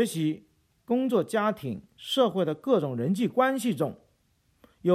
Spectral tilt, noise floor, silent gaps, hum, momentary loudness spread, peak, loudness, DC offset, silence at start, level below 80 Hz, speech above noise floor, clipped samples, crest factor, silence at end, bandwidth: -6 dB/octave; -69 dBFS; none; none; 9 LU; -10 dBFS; -27 LUFS; under 0.1%; 0 s; -70 dBFS; 42 dB; under 0.1%; 16 dB; 0 s; 15.5 kHz